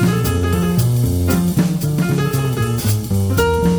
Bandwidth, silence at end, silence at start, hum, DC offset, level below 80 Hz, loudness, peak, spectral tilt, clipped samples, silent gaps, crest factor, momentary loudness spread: over 20 kHz; 0 s; 0 s; none; under 0.1%; -30 dBFS; -17 LUFS; -4 dBFS; -6.5 dB/octave; under 0.1%; none; 12 dB; 2 LU